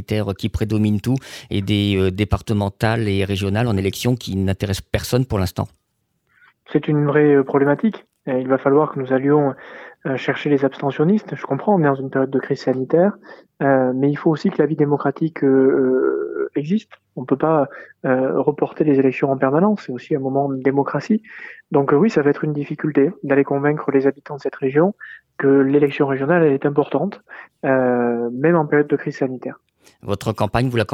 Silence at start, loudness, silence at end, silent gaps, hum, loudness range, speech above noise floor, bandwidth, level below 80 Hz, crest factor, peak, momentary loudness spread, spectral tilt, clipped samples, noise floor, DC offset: 0 s; -19 LUFS; 0 s; none; none; 2 LU; 51 dB; 15.5 kHz; -46 dBFS; 16 dB; -2 dBFS; 9 LU; -7.5 dB/octave; under 0.1%; -70 dBFS; under 0.1%